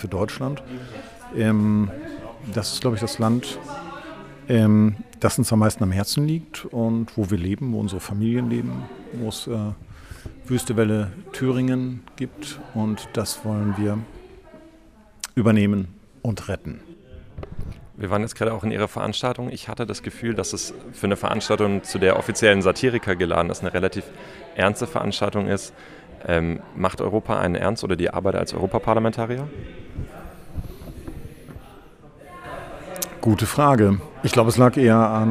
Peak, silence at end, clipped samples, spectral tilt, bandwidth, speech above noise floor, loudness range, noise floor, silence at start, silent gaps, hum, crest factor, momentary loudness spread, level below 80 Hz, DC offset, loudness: -2 dBFS; 0 s; under 0.1%; -6 dB/octave; 15.5 kHz; 28 dB; 7 LU; -50 dBFS; 0 s; none; none; 22 dB; 20 LU; -46 dBFS; under 0.1%; -22 LUFS